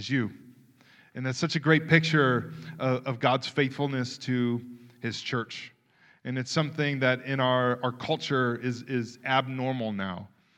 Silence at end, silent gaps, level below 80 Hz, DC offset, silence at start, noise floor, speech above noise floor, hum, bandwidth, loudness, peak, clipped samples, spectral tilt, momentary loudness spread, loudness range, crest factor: 0.3 s; none; -72 dBFS; under 0.1%; 0 s; -62 dBFS; 34 dB; none; 10 kHz; -28 LUFS; -4 dBFS; under 0.1%; -6 dB/octave; 13 LU; 5 LU; 24 dB